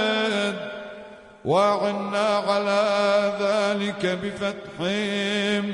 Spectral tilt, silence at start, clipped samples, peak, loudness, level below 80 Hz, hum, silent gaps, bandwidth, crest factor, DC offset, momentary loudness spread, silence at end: -4.5 dB/octave; 0 s; under 0.1%; -10 dBFS; -23 LUFS; -64 dBFS; none; none; 11 kHz; 14 dB; under 0.1%; 12 LU; 0 s